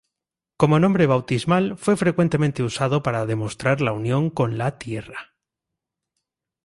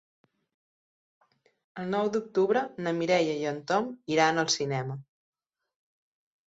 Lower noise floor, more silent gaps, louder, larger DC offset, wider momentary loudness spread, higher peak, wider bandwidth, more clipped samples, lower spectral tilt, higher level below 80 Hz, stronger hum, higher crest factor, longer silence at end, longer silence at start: about the same, -87 dBFS vs under -90 dBFS; neither; first, -21 LUFS vs -28 LUFS; neither; about the same, 10 LU vs 11 LU; first, -2 dBFS vs -10 dBFS; first, 11.5 kHz vs 8 kHz; neither; first, -7 dB/octave vs -4 dB/octave; first, -54 dBFS vs -74 dBFS; neither; about the same, 20 dB vs 20 dB; about the same, 1.4 s vs 1.45 s; second, 0.6 s vs 1.75 s